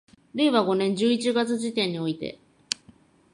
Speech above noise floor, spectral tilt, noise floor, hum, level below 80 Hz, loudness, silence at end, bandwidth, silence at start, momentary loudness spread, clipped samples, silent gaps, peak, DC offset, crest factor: 32 dB; -4.5 dB/octave; -56 dBFS; none; -68 dBFS; -25 LUFS; 1 s; 11.5 kHz; 0.35 s; 11 LU; under 0.1%; none; -2 dBFS; under 0.1%; 24 dB